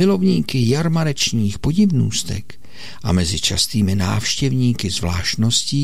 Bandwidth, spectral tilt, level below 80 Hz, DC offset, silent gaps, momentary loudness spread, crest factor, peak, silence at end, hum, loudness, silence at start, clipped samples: 16 kHz; -4.5 dB/octave; -38 dBFS; 3%; none; 6 LU; 14 dB; -6 dBFS; 0 s; none; -18 LUFS; 0 s; under 0.1%